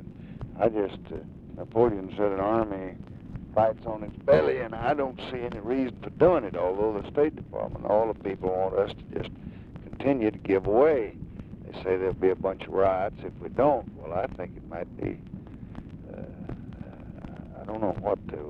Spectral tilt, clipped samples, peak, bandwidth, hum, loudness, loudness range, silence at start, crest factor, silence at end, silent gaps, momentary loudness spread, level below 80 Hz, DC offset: -9.5 dB/octave; under 0.1%; -8 dBFS; 5.4 kHz; none; -27 LUFS; 9 LU; 0 s; 20 dB; 0 s; none; 19 LU; -48 dBFS; under 0.1%